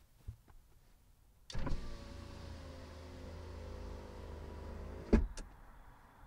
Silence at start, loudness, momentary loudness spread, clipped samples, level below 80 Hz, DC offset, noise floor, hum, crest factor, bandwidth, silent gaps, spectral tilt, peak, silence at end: 0 s; -44 LUFS; 23 LU; under 0.1%; -46 dBFS; under 0.1%; -65 dBFS; none; 28 dB; 15 kHz; none; -7 dB/octave; -14 dBFS; 0 s